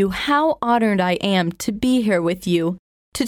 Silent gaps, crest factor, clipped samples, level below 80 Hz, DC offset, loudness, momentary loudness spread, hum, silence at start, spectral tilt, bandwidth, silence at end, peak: 2.79-3.12 s; 14 dB; under 0.1%; -48 dBFS; under 0.1%; -19 LUFS; 7 LU; none; 0 s; -5.5 dB/octave; 17 kHz; 0 s; -6 dBFS